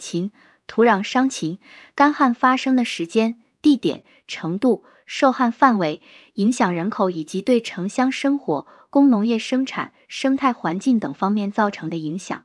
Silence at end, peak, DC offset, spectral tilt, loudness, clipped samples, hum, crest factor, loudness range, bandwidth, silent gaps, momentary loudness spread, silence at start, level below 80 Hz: 0.05 s; -2 dBFS; under 0.1%; -5.5 dB/octave; -20 LUFS; under 0.1%; none; 18 dB; 1 LU; 11.5 kHz; none; 11 LU; 0 s; -68 dBFS